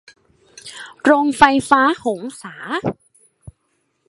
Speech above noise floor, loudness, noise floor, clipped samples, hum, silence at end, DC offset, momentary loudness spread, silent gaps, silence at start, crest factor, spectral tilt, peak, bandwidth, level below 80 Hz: 52 dB; -16 LUFS; -68 dBFS; under 0.1%; none; 1.15 s; under 0.1%; 22 LU; none; 0.65 s; 20 dB; -4.5 dB/octave; 0 dBFS; 11.5 kHz; -52 dBFS